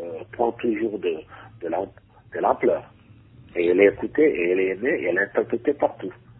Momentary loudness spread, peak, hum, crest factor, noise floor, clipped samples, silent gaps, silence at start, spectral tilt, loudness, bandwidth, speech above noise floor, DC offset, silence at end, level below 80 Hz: 15 LU; -4 dBFS; none; 20 dB; -49 dBFS; under 0.1%; none; 0 s; -10.5 dB/octave; -23 LUFS; 4.1 kHz; 27 dB; under 0.1%; 0.25 s; -58 dBFS